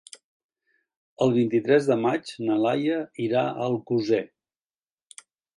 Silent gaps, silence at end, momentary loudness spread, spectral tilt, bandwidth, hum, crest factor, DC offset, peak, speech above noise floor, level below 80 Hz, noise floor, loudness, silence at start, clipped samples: none; 1.3 s; 7 LU; -6.5 dB/octave; 11 kHz; none; 20 dB; under 0.1%; -6 dBFS; over 67 dB; -70 dBFS; under -90 dBFS; -24 LUFS; 1.2 s; under 0.1%